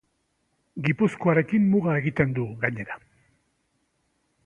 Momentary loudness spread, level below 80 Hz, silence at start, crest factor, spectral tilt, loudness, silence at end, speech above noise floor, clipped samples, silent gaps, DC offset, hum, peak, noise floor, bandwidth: 15 LU; -58 dBFS; 0.75 s; 20 dB; -9 dB/octave; -24 LUFS; 1.5 s; 49 dB; under 0.1%; none; under 0.1%; none; -6 dBFS; -72 dBFS; 9.4 kHz